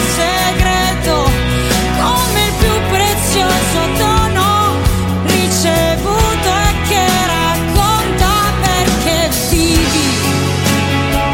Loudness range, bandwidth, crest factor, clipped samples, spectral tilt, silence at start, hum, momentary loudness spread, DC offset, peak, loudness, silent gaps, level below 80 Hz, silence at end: 0 LU; 17 kHz; 12 dB; under 0.1%; -4 dB/octave; 0 s; none; 2 LU; under 0.1%; -2 dBFS; -13 LUFS; none; -22 dBFS; 0 s